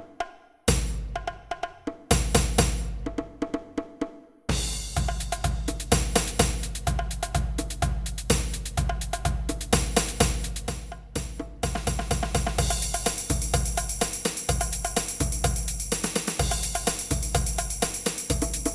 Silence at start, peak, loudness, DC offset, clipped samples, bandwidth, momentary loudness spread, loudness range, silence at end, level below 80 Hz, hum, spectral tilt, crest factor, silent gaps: 0 s; -4 dBFS; -28 LUFS; under 0.1%; under 0.1%; 13.5 kHz; 11 LU; 2 LU; 0 s; -32 dBFS; none; -3.5 dB/octave; 22 dB; none